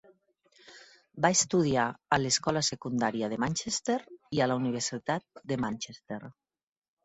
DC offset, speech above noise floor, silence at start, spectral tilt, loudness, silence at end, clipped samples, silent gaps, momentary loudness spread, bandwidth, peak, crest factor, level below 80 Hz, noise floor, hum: under 0.1%; 36 dB; 0.7 s; -3.5 dB/octave; -29 LUFS; 0.75 s; under 0.1%; none; 10 LU; 8.4 kHz; -10 dBFS; 22 dB; -64 dBFS; -66 dBFS; none